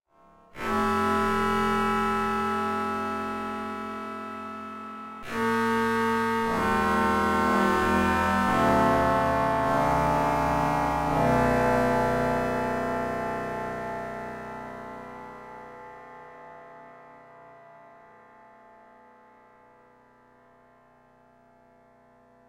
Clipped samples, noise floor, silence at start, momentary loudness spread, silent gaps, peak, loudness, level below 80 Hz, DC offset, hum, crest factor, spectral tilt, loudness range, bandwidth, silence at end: under 0.1%; -58 dBFS; 0.55 s; 18 LU; none; -10 dBFS; -25 LUFS; -46 dBFS; under 0.1%; none; 18 dB; -6 dB/octave; 17 LU; 16 kHz; 4.6 s